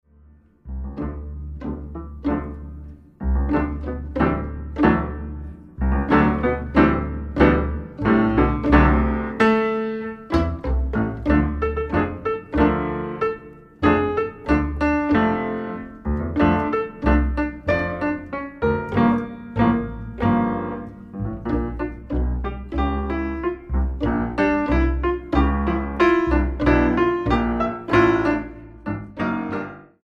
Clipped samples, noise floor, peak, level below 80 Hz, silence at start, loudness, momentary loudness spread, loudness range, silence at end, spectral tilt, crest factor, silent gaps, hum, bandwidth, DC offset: under 0.1%; -52 dBFS; -2 dBFS; -28 dBFS; 0.65 s; -22 LUFS; 13 LU; 6 LU; 0.2 s; -8.5 dB/octave; 20 dB; none; none; 6.6 kHz; under 0.1%